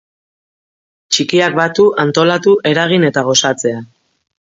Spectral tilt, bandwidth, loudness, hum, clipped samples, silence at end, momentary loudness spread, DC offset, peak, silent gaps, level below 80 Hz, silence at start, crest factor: -4 dB/octave; 7.8 kHz; -12 LUFS; none; under 0.1%; 0.55 s; 5 LU; under 0.1%; 0 dBFS; none; -58 dBFS; 1.1 s; 14 dB